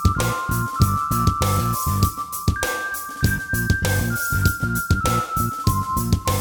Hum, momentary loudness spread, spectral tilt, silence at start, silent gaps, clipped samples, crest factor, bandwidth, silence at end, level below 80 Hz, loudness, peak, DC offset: none; 4 LU; -4.5 dB/octave; 0 s; none; under 0.1%; 16 dB; over 20 kHz; 0 s; -30 dBFS; -21 LUFS; -4 dBFS; under 0.1%